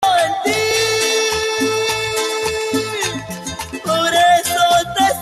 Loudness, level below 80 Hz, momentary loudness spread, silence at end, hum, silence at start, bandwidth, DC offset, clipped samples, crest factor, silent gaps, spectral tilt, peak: -16 LUFS; -48 dBFS; 9 LU; 0 s; none; 0 s; 13 kHz; under 0.1%; under 0.1%; 14 dB; none; -2 dB/octave; -2 dBFS